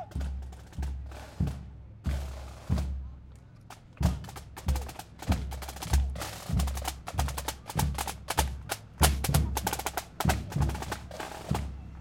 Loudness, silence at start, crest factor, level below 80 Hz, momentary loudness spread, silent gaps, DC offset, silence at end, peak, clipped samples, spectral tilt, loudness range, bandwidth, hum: -33 LUFS; 0 s; 26 dB; -36 dBFS; 15 LU; none; under 0.1%; 0 s; -6 dBFS; under 0.1%; -4.5 dB/octave; 6 LU; 17 kHz; none